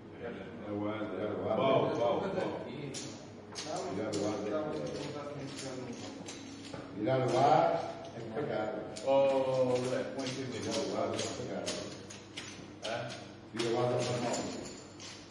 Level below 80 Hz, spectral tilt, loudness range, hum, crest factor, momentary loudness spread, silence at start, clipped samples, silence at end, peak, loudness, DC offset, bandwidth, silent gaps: -70 dBFS; -5 dB/octave; 7 LU; none; 20 dB; 16 LU; 0 s; under 0.1%; 0 s; -14 dBFS; -35 LUFS; under 0.1%; 11.5 kHz; none